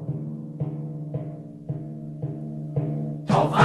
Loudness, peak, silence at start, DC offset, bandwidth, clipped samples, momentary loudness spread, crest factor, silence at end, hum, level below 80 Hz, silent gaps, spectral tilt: -30 LUFS; -4 dBFS; 0 s; under 0.1%; 11.5 kHz; under 0.1%; 12 LU; 22 dB; 0 s; none; -56 dBFS; none; -7.5 dB/octave